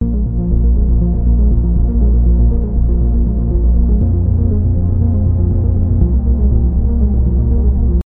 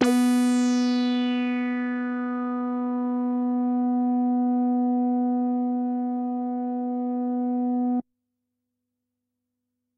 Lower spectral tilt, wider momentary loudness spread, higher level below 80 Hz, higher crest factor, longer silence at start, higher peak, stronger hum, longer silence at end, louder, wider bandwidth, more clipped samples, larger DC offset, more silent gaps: first, -15.5 dB/octave vs -4.5 dB/octave; second, 2 LU vs 6 LU; first, -12 dBFS vs -74 dBFS; second, 12 dB vs 18 dB; about the same, 0 s vs 0 s; first, 0 dBFS vs -8 dBFS; neither; second, 0.05 s vs 1.95 s; first, -14 LUFS vs -25 LUFS; second, 1.4 kHz vs 12 kHz; neither; neither; neither